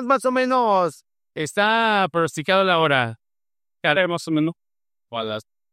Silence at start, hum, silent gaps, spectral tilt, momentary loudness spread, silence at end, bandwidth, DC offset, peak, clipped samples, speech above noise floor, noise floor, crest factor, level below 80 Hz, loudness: 0 s; none; none; -4.5 dB/octave; 12 LU; 0.3 s; 15 kHz; under 0.1%; -4 dBFS; under 0.1%; over 70 dB; under -90 dBFS; 18 dB; -68 dBFS; -20 LUFS